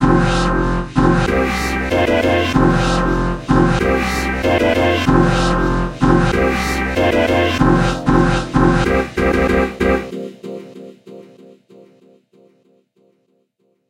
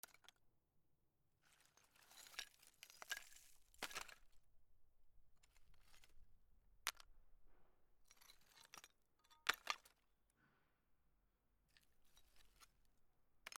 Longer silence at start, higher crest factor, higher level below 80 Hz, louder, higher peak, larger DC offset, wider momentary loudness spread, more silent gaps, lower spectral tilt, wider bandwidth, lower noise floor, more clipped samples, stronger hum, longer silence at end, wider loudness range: about the same, 0 s vs 0.05 s; second, 16 dB vs 40 dB; first, -26 dBFS vs -78 dBFS; first, -15 LUFS vs -50 LUFS; first, 0 dBFS vs -18 dBFS; neither; second, 5 LU vs 24 LU; neither; first, -6 dB/octave vs 0.5 dB/octave; second, 16 kHz vs 18 kHz; second, -64 dBFS vs -82 dBFS; neither; neither; first, 2.7 s vs 0.05 s; about the same, 6 LU vs 6 LU